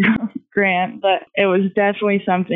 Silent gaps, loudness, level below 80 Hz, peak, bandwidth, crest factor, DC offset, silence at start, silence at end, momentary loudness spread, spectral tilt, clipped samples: none; -18 LUFS; -58 dBFS; -4 dBFS; 4 kHz; 14 dB; under 0.1%; 0 s; 0 s; 3 LU; -9.5 dB/octave; under 0.1%